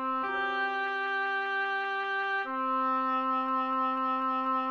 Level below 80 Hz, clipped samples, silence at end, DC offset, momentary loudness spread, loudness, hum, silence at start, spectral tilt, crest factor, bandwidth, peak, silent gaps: -76 dBFS; under 0.1%; 0 s; under 0.1%; 2 LU; -30 LUFS; none; 0 s; -3.5 dB/octave; 10 dB; 6.8 kHz; -20 dBFS; none